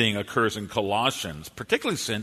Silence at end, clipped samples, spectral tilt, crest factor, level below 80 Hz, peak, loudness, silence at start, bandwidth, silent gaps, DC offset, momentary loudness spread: 0 s; under 0.1%; -3.5 dB/octave; 20 dB; -56 dBFS; -8 dBFS; -26 LUFS; 0 s; 13.5 kHz; none; under 0.1%; 9 LU